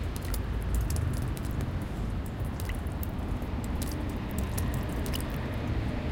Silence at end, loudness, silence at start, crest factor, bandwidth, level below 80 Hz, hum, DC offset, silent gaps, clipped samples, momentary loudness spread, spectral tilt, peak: 0 s; -33 LUFS; 0 s; 16 dB; 17 kHz; -34 dBFS; none; under 0.1%; none; under 0.1%; 4 LU; -6 dB/octave; -14 dBFS